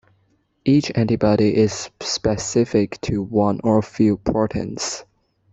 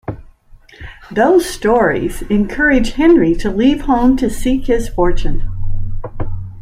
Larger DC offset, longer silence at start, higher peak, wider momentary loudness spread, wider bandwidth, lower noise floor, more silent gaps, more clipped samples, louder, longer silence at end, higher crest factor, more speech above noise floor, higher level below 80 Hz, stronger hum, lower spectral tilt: neither; first, 0.65 s vs 0.1 s; about the same, -4 dBFS vs -2 dBFS; second, 9 LU vs 15 LU; second, 8.2 kHz vs 14.5 kHz; first, -64 dBFS vs -42 dBFS; neither; neither; second, -20 LUFS vs -14 LUFS; first, 0.5 s vs 0 s; about the same, 16 dB vs 12 dB; first, 45 dB vs 30 dB; second, -46 dBFS vs -22 dBFS; neither; about the same, -5.5 dB/octave vs -6 dB/octave